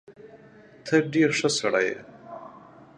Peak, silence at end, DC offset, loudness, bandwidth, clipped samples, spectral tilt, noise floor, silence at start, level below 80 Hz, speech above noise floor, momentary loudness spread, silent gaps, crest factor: -8 dBFS; 0.4 s; under 0.1%; -23 LUFS; 11.5 kHz; under 0.1%; -4 dB/octave; -51 dBFS; 0.1 s; -72 dBFS; 28 dB; 21 LU; none; 20 dB